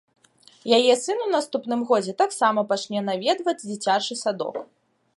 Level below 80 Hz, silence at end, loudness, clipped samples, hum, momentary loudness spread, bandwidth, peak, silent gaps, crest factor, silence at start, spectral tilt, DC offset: -78 dBFS; 0.55 s; -23 LUFS; under 0.1%; none; 8 LU; 11.5 kHz; -2 dBFS; none; 20 dB; 0.65 s; -3.5 dB/octave; under 0.1%